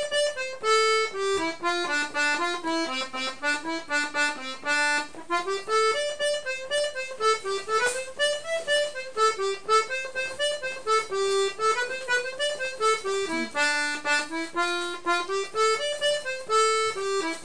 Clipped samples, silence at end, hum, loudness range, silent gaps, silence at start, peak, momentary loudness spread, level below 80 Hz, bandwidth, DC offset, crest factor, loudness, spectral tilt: under 0.1%; 0 s; none; 1 LU; none; 0 s; -12 dBFS; 6 LU; -66 dBFS; 10.5 kHz; 0.7%; 16 dB; -26 LUFS; -0.5 dB/octave